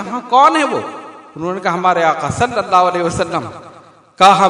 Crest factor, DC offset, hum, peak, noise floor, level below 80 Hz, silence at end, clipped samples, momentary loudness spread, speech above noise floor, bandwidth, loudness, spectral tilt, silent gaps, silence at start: 14 dB; under 0.1%; none; 0 dBFS; -42 dBFS; -50 dBFS; 0 s; 0.4%; 16 LU; 29 dB; 12 kHz; -14 LUFS; -4.5 dB/octave; none; 0 s